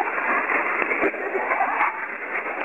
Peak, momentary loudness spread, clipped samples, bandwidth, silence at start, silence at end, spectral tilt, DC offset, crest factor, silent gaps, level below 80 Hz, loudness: -4 dBFS; 6 LU; under 0.1%; 14.5 kHz; 0 s; 0 s; -5.5 dB/octave; 0.2%; 20 dB; none; -68 dBFS; -23 LUFS